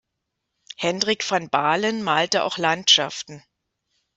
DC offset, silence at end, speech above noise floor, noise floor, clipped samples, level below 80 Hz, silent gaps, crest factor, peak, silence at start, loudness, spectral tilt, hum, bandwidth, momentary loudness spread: under 0.1%; 0.75 s; 58 dB; -80 dBFS; under 0.1%; -68 dBFS; none; 20 dB; -4 dBFS; 0.8 s; -20 LUFS; -2 dB/octave; none; 8.2 kHz; 14 LU